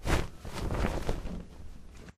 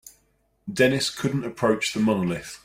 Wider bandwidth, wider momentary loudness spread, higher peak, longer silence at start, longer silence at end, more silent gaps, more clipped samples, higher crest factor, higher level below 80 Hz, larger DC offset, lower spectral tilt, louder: about the same, 15.5 kHz vs 16 kHz; first, 18 LU vs 9 LU; second, -14 dBFS vs -6 dBFS; about the same, 0 s vs 0.05 s; about the same, 0.05 s vs 0.1 s; neither; neither; about the same, 20 dB vs 20 dB; first, -36 dBFS vs -56 dBFS; neither; about the same, -5.5 dB/octave vs -5 dB/octave; second, -36 LUFS vs -24 LUFS